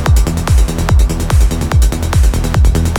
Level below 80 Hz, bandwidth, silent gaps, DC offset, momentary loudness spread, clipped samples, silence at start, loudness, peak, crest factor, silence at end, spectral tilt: -12 dBFS; 17.5 kHz; none; under 0.1%; 1 LU; under 0.1%; 0 s; -13 LUFS; 0 dBFS; 10 dB; 0 s; -5.5 dB/octave